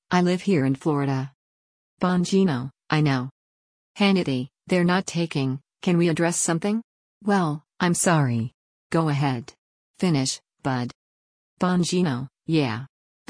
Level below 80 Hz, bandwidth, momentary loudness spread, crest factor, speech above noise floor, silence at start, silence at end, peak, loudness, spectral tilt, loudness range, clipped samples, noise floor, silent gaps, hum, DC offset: -62 dBFS; 10.5 kHz; 9 LU; 18 dB; over 68 dB; 0.1 s; 0.45 s; -6 dBFS; -24 LUFS; -5.5 dB/octave; 3 LU; under 0.1%; under -90 dBFS; 1.35-1.97 s, 3.31-3.95 s, 6.84-7.21 s, 8.54-8.90 s, 9.58-9.94 s, 10.95-11.57 s; none; under 0.1%